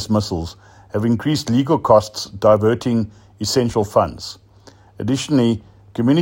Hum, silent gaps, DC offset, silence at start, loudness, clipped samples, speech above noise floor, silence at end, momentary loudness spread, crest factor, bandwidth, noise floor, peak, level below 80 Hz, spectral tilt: none; none; under 0.1%; 0 s; -18 LUFS; under 0.1%; 30 dB; 0 s; 13 LU; 18 dB; 16.5 kHz; -47 dBFS; 0 dBFS; -48 dBFS; -6 dB/octave